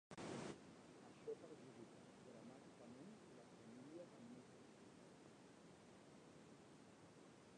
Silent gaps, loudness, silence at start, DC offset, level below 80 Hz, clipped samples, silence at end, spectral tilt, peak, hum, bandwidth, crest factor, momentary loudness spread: none; -61 LUFS; 0.1 s; under 0.1%; -86 dBFS; under 0.1%; 0 s; -5 dB/octave; -40 dBFS; none; 10 kHz; 20 dB; 11 LU